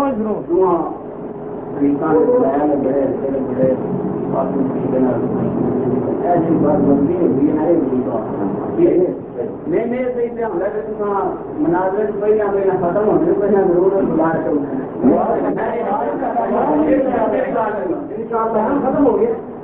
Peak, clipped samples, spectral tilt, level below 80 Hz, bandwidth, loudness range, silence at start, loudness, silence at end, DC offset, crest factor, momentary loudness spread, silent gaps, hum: -2 dBFS; under 0.1%; -13 dB/octave; -46 dBFS; 3.6 kHz; 3 LU; 0 s; -17 LUFS; 0 s; under 0.1%; 14 dB; 7 LU; none; none